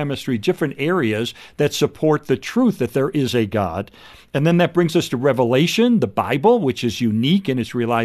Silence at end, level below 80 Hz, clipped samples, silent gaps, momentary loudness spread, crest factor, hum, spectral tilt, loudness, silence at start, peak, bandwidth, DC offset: 0 s; -54 dBFS; under 0.1%; none; 6 LU; 14 dB; none; -6 dB/octave; -19 LUFS; 0 s; -4 dBFS; 13.5 kHz; under 0.1%